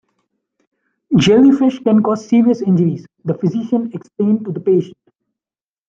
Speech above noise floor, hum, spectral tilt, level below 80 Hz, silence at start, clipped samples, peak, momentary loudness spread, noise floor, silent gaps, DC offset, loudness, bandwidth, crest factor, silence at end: over 76 dB; none; -7.5 dB/octave; -54 dBFS; 1.1 s; under 0.1%; -2 dBFS; 10 LU; under -90 dBFS; none; under 0.1%; -15 LUFS; 7.8 kHz; 14 dB; 1 s